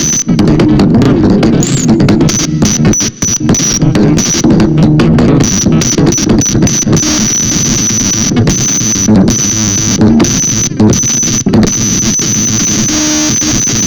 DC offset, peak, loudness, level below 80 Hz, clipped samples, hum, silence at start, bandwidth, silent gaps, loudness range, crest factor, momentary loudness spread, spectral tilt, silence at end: under 0.1%; 0 dBFS; -8 LUFS; -26 dBFS; under 0.1%; none; 0 s; over 20 kHz; none; 1 LU; 8 dB; 2 LU; -4 dB/octave; 0 s